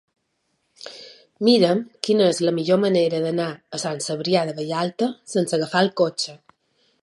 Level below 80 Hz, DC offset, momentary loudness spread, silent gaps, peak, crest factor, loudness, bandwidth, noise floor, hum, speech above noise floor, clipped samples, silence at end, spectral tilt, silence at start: -70 dBFS; under 0.1%; 11 LU; none; -4 dBFS; 18 dB; -21 LUFS; 11.5 kHz; -72 dBFS; none; 51 dB; under 0.1%; 0.65 s; -5 dB/octave; 0.8 s